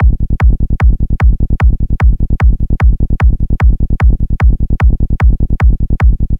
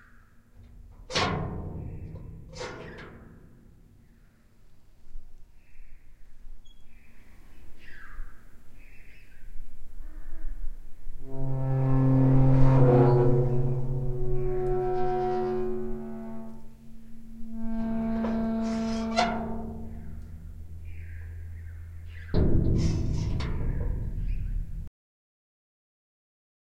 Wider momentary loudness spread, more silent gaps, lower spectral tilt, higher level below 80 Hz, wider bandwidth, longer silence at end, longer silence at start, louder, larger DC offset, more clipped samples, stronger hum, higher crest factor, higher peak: second, 0 LU vs 26 LU; neither; first, -9.5 dB/octave vs -7.5 dB/octave; first, -10 dBFS vs -34 dBFS; second, 3.5 kHz vs 8 kHz; second, 0 s vs 1.9 s; second, 0 s vs 0.35 s; first, -13 LUFS vs -28 LUFS; first, 3% vs under 0.1%; neither; neither; second, 10 dB vs 20 dB; first, 0 dBFS vs -8 dBFS